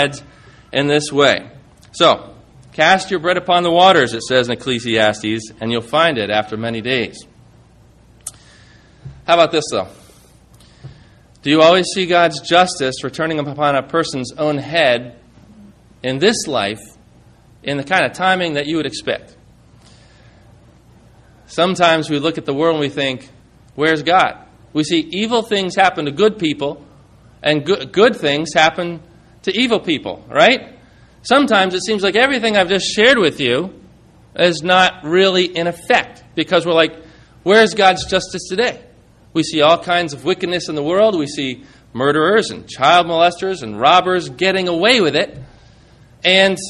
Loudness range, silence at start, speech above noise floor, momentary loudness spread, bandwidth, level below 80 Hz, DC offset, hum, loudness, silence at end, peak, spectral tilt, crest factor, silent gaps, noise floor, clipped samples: 6 LU; 0 s; 32 dB; 12 LU; 13 kHz; -52 dBFS; under 0.1%; none; -15 LUFS; 0 s; 0 dBFS; -4 dB/octave; 16 dB; none; -47 dBFS; under 0.1%